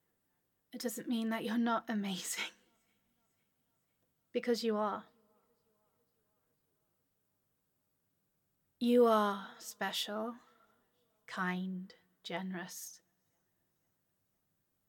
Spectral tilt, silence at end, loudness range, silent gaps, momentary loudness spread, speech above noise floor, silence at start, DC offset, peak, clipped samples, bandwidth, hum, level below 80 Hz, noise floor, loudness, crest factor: -4.5 dB/octave; 1.9 s; 8 LU; none; 17 LU; 46 dB; 0.75 s; under 0.1%; -18 dBFS; under 0.1%; 17.5 kHz; none; under -90 dBFS; -81 dBFS; -36 LUFS; 22 dB